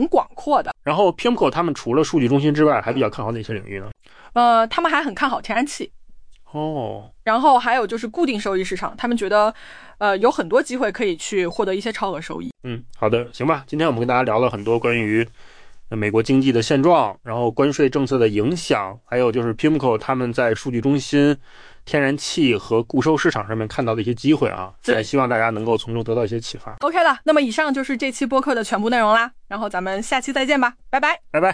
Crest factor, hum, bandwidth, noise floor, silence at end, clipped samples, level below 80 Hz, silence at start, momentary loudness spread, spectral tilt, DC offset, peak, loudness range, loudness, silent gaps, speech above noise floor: 14 dB; none; 10.5 kHz; -41 dBFS; 0 s; under 0.1%; -48 dBFS; 0 s; 9 LU; -5.5 dB/octave; under 0.1%; -4 dBFS; 2 LU; -20 LUFS; none; 21 dB